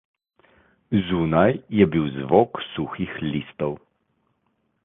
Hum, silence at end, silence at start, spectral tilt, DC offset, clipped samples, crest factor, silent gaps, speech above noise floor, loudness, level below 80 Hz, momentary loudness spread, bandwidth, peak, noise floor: none; 1.05 s; 0.9 s; -10.5 dB/octave; under 0.1%; under 0.1%; 22 dB; none; 49 dB; -22 LUFS; -50 dBFS; 10 LU; 3.9 kHz; -2 dBFS; -71 dBFS